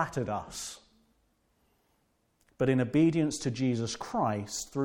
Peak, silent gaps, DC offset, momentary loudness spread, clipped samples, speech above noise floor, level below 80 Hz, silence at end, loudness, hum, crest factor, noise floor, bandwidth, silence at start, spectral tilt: -14 dBFS; none; under 0.1%; 14 LU; under 0.1%; 43 dB; -62 dBFS; 0 s; -30 LUFS; none; 18 dB; -73 dBFS; 17 kHz; 0 s; -5.5 dB/octave